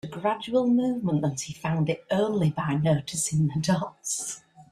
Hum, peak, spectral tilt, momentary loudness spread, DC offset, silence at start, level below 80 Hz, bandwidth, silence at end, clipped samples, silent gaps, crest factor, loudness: none; -10 dBFS; -5.5 dB/octave; 6 LU; under 0.1%; 0.05 s; -60 dBFS; 13.5 kHz; 0.1 s; under 0.1%; none; 16 dB; -26 LUFS